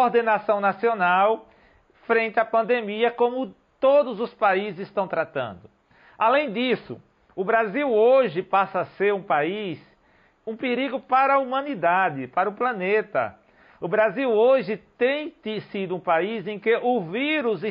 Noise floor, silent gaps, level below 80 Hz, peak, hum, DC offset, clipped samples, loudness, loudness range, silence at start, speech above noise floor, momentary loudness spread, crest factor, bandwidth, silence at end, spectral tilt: -60 dBFS; none; -68 dBFS; -10 dBFS; none; under 0.1%; under 0.1%; -23 LUFS; 2 LU; 0 s; 38 dB; 12 LU; 14 dB; 5.4 kHz; 0 s; -9 dB/octave